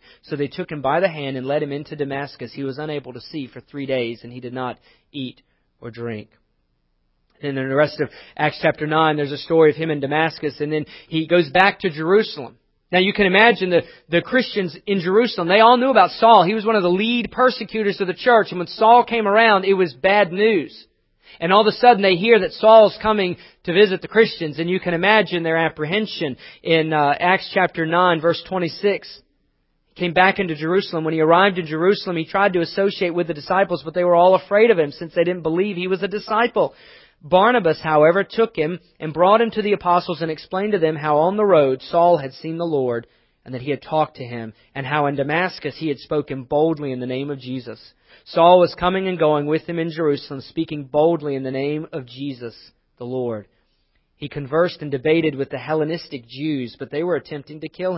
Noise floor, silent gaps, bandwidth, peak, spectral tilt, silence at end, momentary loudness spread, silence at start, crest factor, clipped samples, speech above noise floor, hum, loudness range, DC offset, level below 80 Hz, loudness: -67 dBFS; none; 5.8 kHz; 0 dBFS; -9 dB/octave; 0 s; 16 LU; 0.3 s; 20 dB; under 0.1%; 48 dB; none; 10 LU; under 0.1%; -56 dBFS; -18 LUFS